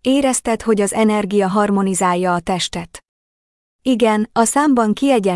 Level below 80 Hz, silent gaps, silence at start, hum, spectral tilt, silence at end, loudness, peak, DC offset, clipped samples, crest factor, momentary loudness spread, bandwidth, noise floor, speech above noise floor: -48 dBFS; 3.09-3.79 s; 0.05 s; none; -4.5 dB/octave; 0 s; -16 LUFS; -4 dBFS; under 0.1%; under 0.1%; 14 dB; 6 LU; 12 kHz; under -90 dBFS; over 74 dB